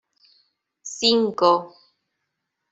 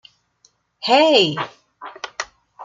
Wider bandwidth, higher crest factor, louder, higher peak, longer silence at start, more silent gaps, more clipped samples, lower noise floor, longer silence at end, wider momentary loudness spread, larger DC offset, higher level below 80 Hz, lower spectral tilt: second, 8 kHz vs 9.4 kHz; about the same, 22 dB vs 20 dB; second, -20 LUFS vs -17 LUFS; about the same, -4 dBFS vs -2 dBFS; about the same, 0.85 s vs 0.8 s; neither; neither; first, -79 dBFS vs -60 dBFS; first, 1.05 s vs 0 s; second, 17 LU vs 22 LU; neither; about the same, -68 dBFS vs -68 dBFS; about the same, -3 dB/octave vs -3.5 dB/octave